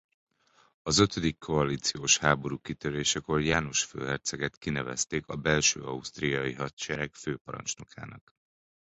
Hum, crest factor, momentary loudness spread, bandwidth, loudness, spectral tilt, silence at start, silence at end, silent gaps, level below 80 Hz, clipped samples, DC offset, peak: none; 24 dB; 12 LU; 8.4 kHz; -29 LUFS; -3 dB/octave; 0.85 s; 0.7 s; 4.57-4.61 s, 6.73-6.77 s, 7.41-7.45 s; -52 dBFS; under 0.1%; under 0.1%; -6 dBFS